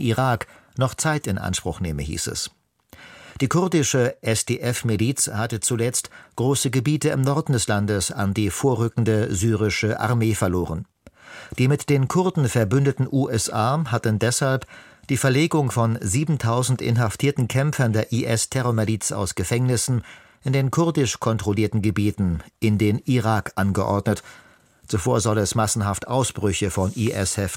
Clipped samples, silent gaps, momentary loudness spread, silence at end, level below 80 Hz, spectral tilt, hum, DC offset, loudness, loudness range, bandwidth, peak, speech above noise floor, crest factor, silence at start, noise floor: under 0.1%; none; 6 LU; 0 s; -46 dBFS; -5 dB/octave; none; under 0.1%; -22 LUFS; 2 LU; 16.5 kHz; -6 dBFS; 28 dB; 16 dB; 0 s; -49 dBFS